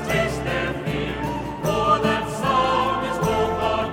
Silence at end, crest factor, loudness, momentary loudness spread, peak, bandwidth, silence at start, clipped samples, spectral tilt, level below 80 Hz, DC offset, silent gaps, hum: 0 s; 16 dB; -22 LUFS; 7 LU; -6 dBFS; 18.5 kHz; 0 s; under 0.1%; -5.5 dB/octave; -40 dBFS; under 0.1%; none; none